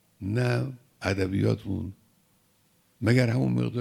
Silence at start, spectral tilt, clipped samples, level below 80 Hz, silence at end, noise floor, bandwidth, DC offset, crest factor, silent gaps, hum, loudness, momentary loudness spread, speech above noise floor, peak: 0.2 s; -7.5 dB/octave; under 0.1%; -58 dBFS; 0 s; -66 dBFS; 13.5 kHz; under 0.1%; 20 dB; none; none; -27 LUFS; 11 LU; 40 dB; -6 dBFS